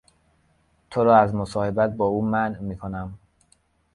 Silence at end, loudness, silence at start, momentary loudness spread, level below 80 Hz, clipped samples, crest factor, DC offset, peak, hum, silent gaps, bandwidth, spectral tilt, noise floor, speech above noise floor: 0.8 s; -22 LUFS; 0.9 s; 15 LU; -50 dBFS; under 0.1%; 22 dB; under 0.1%; -2 dBFS; none; none; 11.5 kHz; -8 dB/octave; -64 dBFS; 42 dB